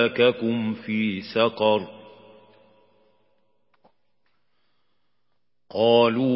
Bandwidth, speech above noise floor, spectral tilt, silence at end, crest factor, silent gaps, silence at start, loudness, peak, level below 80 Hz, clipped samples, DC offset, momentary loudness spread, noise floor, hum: 5.8 kHz; 58 dB; -10 dB/octave; 0 s; 18 dB; none; 0 s; -22 LUFS; -6 dBFS; -68 dBFS; under 0.1%; under 0.1%; 9 LU; -79 dBFS; 60 Hz at -70 dBFS